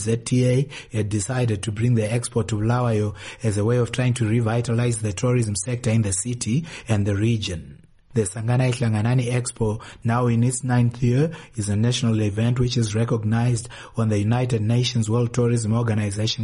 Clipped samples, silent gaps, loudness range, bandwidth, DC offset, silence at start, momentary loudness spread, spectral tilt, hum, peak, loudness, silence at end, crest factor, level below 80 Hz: under 0.1%; none; 2 LU; 11.5 kHz; under 0.1%; 0 s; 5 LU; -6 dB/octave; none; -8 dBFS; -22 LUFS; 0 s; 14 dB; -46 dBFS